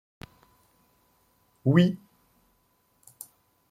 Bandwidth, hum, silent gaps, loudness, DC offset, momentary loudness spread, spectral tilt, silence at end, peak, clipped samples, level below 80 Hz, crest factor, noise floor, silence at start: 15.5 kHz; none; none; -24 LUFS; under 0.1%; 28 LU; -7.5 dB/octave; 1.75 s; -6 dBFS; under 0.1%; -66 dBFS; 24 dB; -69 dBFS; 1.65 s